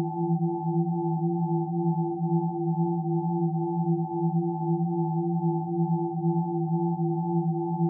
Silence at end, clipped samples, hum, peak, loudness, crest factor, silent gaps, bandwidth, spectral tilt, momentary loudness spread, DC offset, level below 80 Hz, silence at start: 0 s; under 0.1%; none; -16 dBFS; -27 LUFS; 12 dB; none; 1 kHz; -5.5 dB/octave; 1 LU; under 0.1%; -78 dBFS; 0 s